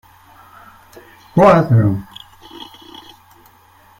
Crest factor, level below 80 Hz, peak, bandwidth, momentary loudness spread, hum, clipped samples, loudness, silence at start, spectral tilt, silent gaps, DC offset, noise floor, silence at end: 18 dB; -48 dBFS; -2 dBFS; 15.5 kHz; 27 LU; none; under 0.1%; -13 LUFS; 1.35 s; -8.5 dB/octave; none; under 0.1%; -49 dBFS; 1.35 s